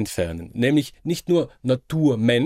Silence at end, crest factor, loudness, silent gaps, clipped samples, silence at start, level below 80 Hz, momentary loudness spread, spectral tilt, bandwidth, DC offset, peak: 0 s; 14 dB; -22 LUFS; none; under 0.1%; 0 s; -48 dBFS; 8 LU; -6 dB/octave; 16 kHz; under 0.1%; -8 dBFS